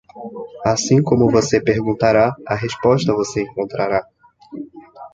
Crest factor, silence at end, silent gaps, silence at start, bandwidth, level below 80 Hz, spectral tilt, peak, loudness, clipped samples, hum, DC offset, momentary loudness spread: 16 dB; 0.05 s; none; 0.15 s; 9.2 kHz; -46 dBFS; -5.5 dB/octave; -2 dBFS; -17 LUFS; under 0.1%; none; under 0.1%; 19 LU